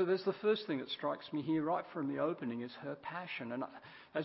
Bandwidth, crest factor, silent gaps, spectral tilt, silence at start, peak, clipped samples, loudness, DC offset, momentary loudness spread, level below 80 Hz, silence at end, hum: 5.6 kHz; 16 dB; none; -4 dB/octave; 0 s; -22 dBFS; under 0.1%; -38 LUFS; under 0.1%; 10 LU; -80 dBFS; 0 s; none